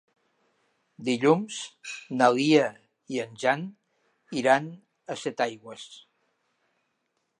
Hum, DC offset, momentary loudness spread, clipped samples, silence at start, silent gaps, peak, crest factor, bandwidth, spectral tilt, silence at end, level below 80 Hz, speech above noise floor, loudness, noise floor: none; under 0.1%; 20 LU; under 0.1%; 1 s; none; -6 dBFS; 22 dB; 11.5 kHz; -5 dB/octave; 1.45 s; -78 dBFS; 51 dB; -26 LUFS; -77 dBFS